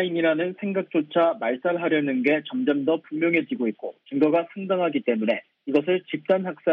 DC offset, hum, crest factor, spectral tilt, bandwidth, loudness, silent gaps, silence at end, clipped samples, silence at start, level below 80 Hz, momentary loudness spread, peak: under 0.1%; none; 16 dB; -8.5 dB/octave; 5.2 kHz; -24 LUFS; none; 0 s; under 0.1%; 0 s; -76 dBFS; 6 LU; -6 dBFS